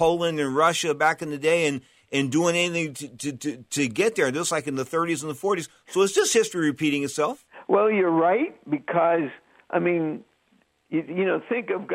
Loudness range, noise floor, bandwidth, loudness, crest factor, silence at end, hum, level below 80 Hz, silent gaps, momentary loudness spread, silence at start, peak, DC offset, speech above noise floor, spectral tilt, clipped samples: 3 LU; -65 dBFS; 16 kHz; -24 LUFS; 16 dB; 0 s; none; -66 dBFS; none; 10 LU; 0 s; -8 dBFS; under 0.1%; 41 dB; -4 dB/octave; under 0.1%